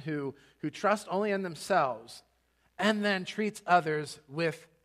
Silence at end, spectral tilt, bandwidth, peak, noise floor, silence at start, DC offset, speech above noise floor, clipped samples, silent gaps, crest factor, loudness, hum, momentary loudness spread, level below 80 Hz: 0.2 s; -5 dB/octave; 15 kHz; -10 dBFS; -71 dBFS; 0 s; under 0.1%; 41 dB; under 0.1%; none; 20 dB; -31 LUFS; none; 13 LU; -76 dBFS